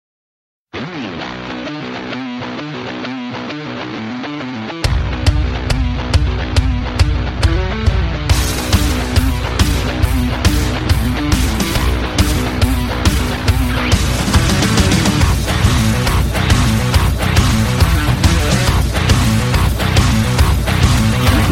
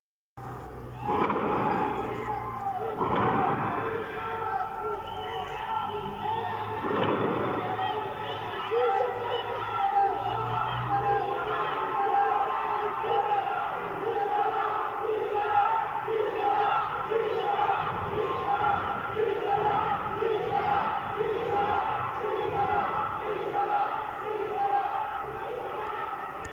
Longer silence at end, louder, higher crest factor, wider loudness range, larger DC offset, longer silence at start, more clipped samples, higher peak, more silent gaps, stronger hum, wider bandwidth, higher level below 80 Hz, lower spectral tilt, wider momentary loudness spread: about the same, 0 s vs 0 s; first, -16 LUFS vs -29 LUFS; about the same, 14 dB vs 16 dB; first, 10 LU vs 3 LU; neither; first, 0.75 s vs 0.35 s; neither; first, 0 dBFS vs -14 dBFS; neither; neither; about the same, 16.5 kHz vs 16.5 kHz; first, -18 dBFS vs -58 dBFS; second, -5 dB/octave vs -6.5 dB/octave; first, 11 LU vs 8 LU